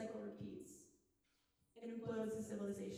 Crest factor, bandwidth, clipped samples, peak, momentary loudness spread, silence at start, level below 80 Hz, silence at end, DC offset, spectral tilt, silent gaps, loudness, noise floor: 16 dB; 15.5 kHz; under 0.1%; -32 dBFS; 12 LU; 0 s; -78 dBFS; 0 s; under 0.1%; -6.5 dB/octave; none; -48 LUFS; -82 dBFS